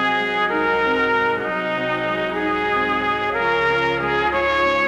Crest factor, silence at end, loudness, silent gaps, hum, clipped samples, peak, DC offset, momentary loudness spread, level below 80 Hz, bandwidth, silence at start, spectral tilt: 12 dB; 0 s; -19 LUFS; none; none; under 0.1%; -8 dBFS; under 0.1%; 4 LU; -46 dBFS; 13.5 kHz; 0 s; -5 dB/octave